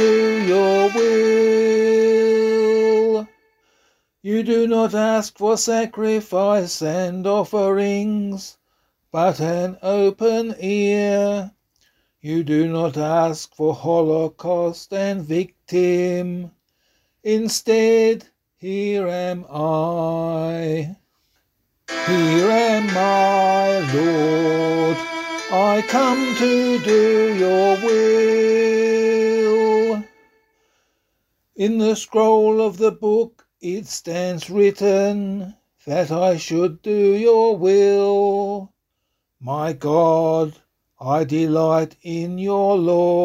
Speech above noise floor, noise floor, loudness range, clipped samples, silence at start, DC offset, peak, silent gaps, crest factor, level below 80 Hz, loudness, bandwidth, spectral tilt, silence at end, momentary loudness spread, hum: 57 dB; -75 dBFS; 5 LU; under 0.1%; 0 s; under 0.1%; -4 dBFS; none; 14 dB; -62 dBFS; -18 LUFS; 15 kHz; -5.5 dB/octave; 0 s; 11 LU; none